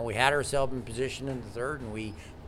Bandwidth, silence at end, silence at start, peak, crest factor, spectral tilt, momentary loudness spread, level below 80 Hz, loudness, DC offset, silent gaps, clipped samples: 15.5 kHz; 0 s; 0 s; -6 dBFS; 24 dB; -4.5 dB/octave; 12 LU; -48 dBFS; -31 LUFS; under 0.1%; none; under 0.1%